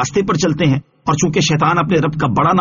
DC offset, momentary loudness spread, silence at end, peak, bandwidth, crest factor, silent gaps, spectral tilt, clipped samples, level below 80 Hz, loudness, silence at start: under 0.1%; 3 LU; 0 s; -2 dBFS; 7.4 kHz; 12 dB; none; -5.5 dB/octave; under 0.1%; -42 dBFS; -15 LUFS; 0 s